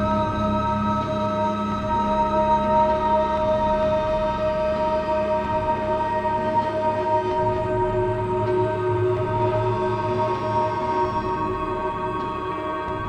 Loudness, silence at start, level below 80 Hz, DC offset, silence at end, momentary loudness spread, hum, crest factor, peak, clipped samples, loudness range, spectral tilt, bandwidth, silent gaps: -23 LUFS; 0 s; -40 dBFS; under 0.1%; 0 s; 5 LU; none; 14 dB; -8 dBFS; under 0.1%; 2 LU; -7.5 dB/octave; 9 kHz; none